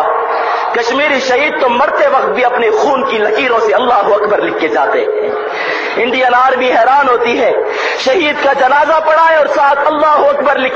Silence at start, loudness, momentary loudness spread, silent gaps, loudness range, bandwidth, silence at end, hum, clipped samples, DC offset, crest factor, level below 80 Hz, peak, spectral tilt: 0 s; -11 LUFS; 5 LU; none; 2 LU; 7.8 kHz; 0 s; none; under 0.1%; under 0.1%; 10 dB; -52 dBFS; 0 dBFS; -3 dB/octave